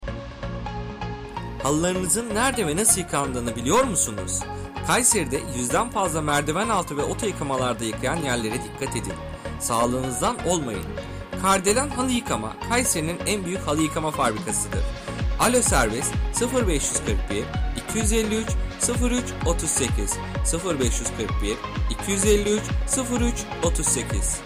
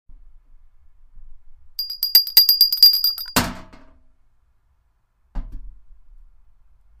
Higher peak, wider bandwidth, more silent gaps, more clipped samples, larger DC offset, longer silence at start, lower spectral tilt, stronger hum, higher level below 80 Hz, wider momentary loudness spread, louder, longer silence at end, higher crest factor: second, -4 dBFS vs 0 dBFS; about the same, 16 kHz vs 16 kHz; neither; neither; neither; second, 0 s vs 1.15 s; first, -3.5 dB/octave vs -1 dB/octave; neither; first, -32 dBFS vs -40 dBFS; second, 10 LU vs 26 LU; second, -23 LUFS vs -14 LUFS; second, 0 s vs 1.3 s; about the same, 20 dB vs 22 dB